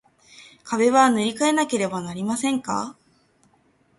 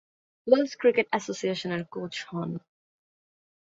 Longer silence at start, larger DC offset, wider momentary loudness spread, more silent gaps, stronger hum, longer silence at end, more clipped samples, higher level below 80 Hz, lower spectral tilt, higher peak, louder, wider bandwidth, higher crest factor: about the same, 0.4 s vs 0.45 s; neither; about the same, 12 LU vs 12 LU; neither; neither; second, 1.05 s vs 1.2 s; neither; first, -66 dBFS vs -72 dBFS; about the same, -4 dB/octave vs -5 dB/octave; about the same, -4 dBFS vs -6 dBFS; first, -22 LUFS vs -27 LUFS; first, 11.5 kHz vs 7.8 kHz; second, 18 dB vs 24 dB